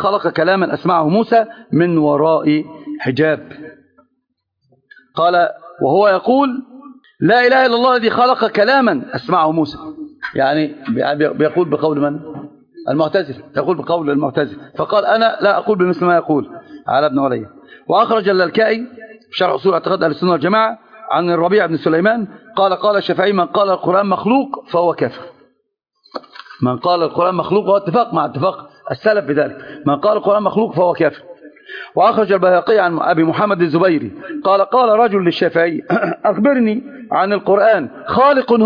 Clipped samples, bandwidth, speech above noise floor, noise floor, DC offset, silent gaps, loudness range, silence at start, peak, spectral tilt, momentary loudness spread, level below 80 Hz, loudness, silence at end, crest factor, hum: under 0.1%; 5.2 kHz; 56 dB; -71 dBFS; under 0.1%; none; 4 LU; 0 s; -2 dBFS; -8.5 dB/octave; 11 LU; -60 dBFS; -15 LUFS; 0 s; 14 dB; none